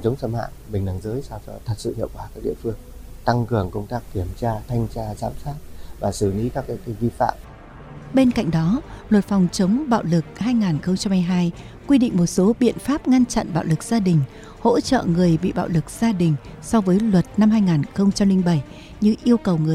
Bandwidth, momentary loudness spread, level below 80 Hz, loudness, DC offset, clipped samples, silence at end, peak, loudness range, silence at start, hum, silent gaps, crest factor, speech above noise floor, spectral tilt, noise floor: 15 kHz; 12 LU; -40 dBFS; -21 LUFS; under 0.1%; under 0.1%; 0 s; -4 dBFS; 7 LU; 0 s; none; none; 18 dB; 19 dB; -7 dB/octave; -39 dBFS